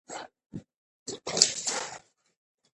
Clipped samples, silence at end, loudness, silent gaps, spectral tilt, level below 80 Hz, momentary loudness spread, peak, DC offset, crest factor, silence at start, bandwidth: under 0.1%; 0.8 s; -26 LUFS; 0.46-0.50 s, 0.76-1.06 s; -0.5 dB/octave; -70 dBFS; 23 LU; -2 dBFS; under 0.1%; 32 dB; 0.1 s; 11.5 kHz